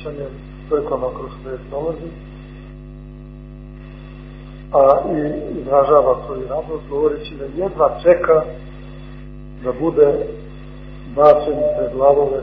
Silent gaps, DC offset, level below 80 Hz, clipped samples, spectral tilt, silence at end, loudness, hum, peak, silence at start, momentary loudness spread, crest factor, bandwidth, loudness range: none; under 0.1%; -38 dBFS; under 0.1%; -9.5 dB/octave; 0 s; -17 LUFS; 50 Hz at -35 dBFS; 0 dBFS; 0 s; 24 LU; 18 dB; 4.9 kHz; 11 LU